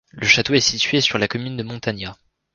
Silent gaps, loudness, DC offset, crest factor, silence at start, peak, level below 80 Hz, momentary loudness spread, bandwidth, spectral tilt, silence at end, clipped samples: none; -18 LUFS; under 0.1%; 20 dB; 0.15 s; 0 dBFS; -50 dBFS; 14 LU; 10.5 kHz; -3 dB/octave; 0.4 s; under 0.1%